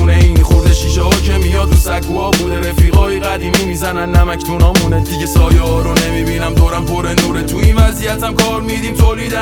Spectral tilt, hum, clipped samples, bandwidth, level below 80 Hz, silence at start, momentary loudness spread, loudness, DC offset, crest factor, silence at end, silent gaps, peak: -5.5 dB/octave; none; under 0.1%; 17.5 kHz; -14 dBFS; 0 s; 6 LU; -13 LUFS; under 0.1%; 10 dB; 0 s; none; 0 dBFS